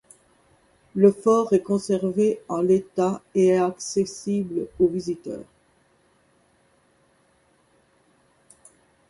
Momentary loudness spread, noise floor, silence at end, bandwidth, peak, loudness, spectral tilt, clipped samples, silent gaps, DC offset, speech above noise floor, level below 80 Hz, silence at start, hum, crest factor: 11 LU; -63 dBFS; 3.65 s; 11.5 kHz; -4 dBFS; -23 LUFS; -6.5 dB/octave; under 0.1%; none; under 0.1%; 41 dB; -62 dBFS; 0.95 s; none; 22 dB